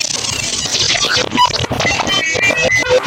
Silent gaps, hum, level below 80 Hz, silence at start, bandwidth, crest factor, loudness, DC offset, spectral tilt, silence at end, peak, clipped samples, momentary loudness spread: none; none; -38 dBFS; 0 s; 16.5 kHz; 12 dB; -13 LUFS; under 0.1%; -1.5 dB/octave; 0 s; -2 dBFS; under 0.1%; 4 LU